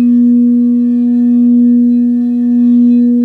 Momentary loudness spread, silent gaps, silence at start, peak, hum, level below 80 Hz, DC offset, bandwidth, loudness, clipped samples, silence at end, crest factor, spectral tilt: 3 LU; none; 0 s; -2 dBFS; 60 Hz at -20 dBFS; -58 dBFS; under 0.1%; 1.9 kHz; -9 LUFS; under 0.1%; 0 s; 6 dB; -10.5 dB/octave